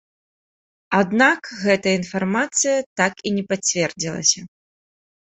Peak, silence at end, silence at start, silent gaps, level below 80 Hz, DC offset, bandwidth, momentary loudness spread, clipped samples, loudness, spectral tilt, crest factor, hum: -2 dBFS; 0.9 s; 0.9 s; 2.86-2.96 s; -62 dBFS; under 0.1%; 8.4 kHz; 6 LU; under 0.1%; -20 LUFS; -3 dB/octave; 20 dB; none